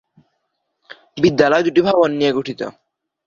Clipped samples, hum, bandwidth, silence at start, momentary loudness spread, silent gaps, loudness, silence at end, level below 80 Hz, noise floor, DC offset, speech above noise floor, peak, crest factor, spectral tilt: under 0.1%; none; 7.4 kHz; 1.15 s; 15 LU; none; -16 LUFS; 0.55 s; -56 dBFS; -72 dBFS; under 0.1%; 57 dB; 0 dBFS; 18 dB; -6 dB/octave